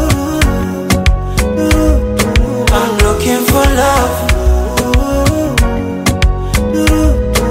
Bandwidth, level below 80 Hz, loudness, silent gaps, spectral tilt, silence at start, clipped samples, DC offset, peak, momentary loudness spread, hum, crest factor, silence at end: 16.5 kHz; -14 dBFS; -12 LUFS; none; -5 dB/octave; 0 s; under 0.1%; under 0.1%; 0 dBFS; 4 LU; none; 10 dB; 0 s